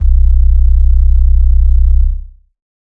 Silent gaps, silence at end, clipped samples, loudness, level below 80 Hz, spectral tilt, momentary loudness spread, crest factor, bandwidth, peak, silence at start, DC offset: none; 0.75 s; under 0.1%; -12 LUFS; -8 dBFS; -10 dB/octave; 4 LU; 8 dB; 0.6 kHz; 0 dBFS; 0 s; under 0.1%